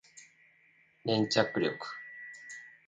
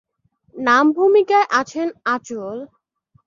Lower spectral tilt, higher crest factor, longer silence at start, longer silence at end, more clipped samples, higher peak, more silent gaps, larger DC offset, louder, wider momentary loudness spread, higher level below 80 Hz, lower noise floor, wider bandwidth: about the same, -4.5 dB/octave vs -4 dB/octave; first, 26 dB vs 16 dB; second, 0.15 s vs 0.55 s; second, 0.15 s vs 0.6 s; neither; second, -10 dBFS vs -2 dBFS; neither; neither; second, -32 LUFS vs -17 LUFS; first, 19 LU vs 15 LU; second, -74 dBFS vs -68 dBFS; first, -66 dBFS vs -62 dBFS; first, 9.4 kHz vs 7.4 kHz